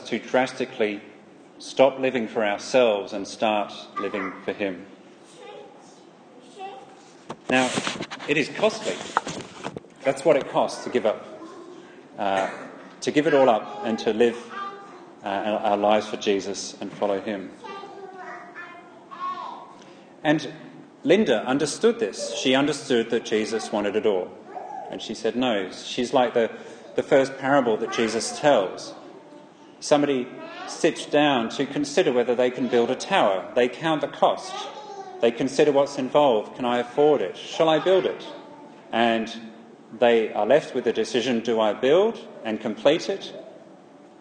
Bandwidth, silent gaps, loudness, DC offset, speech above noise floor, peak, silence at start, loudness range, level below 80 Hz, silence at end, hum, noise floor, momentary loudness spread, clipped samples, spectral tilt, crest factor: 10 kHz; none; -23 LUFS; under 0.1%; 26 dB; -4 dBFS; 0 s; 7 LU; -70 dBFS; 0.45 s; none; -49 dBFS; 18 LU; under 0.1%; -4 dB/octave; 22 dB